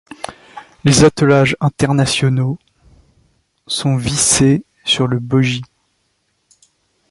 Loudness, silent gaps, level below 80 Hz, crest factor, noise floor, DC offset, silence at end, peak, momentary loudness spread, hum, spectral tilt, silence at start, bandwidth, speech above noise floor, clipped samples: -14 LUFS; none; -42 dBFS; 16 dB; -65 dBFS; under 0.1%; 1.45 s; 0 dBFS; 13 LU; none; -4.5 dB/octave; 0.3 s; 11.5 kHz; 52 dB; under 0.1%